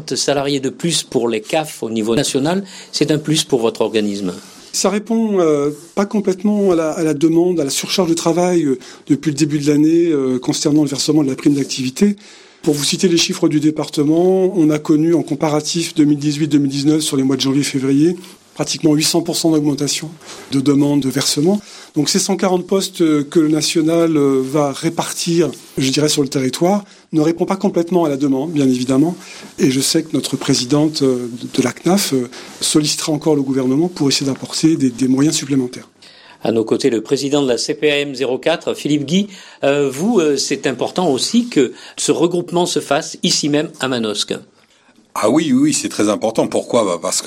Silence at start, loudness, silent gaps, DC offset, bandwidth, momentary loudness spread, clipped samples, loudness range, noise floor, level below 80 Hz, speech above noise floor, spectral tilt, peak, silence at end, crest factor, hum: 0 s; -16 LUFS; none; under 0.1%; 16.5 kHz; 6 LU; under 0.1%; 2 LU; -52 dBFS; -58 dBFS; 36 dB; -4.5 dB/octave; -2 dBFS; 0 s; 14 dB; none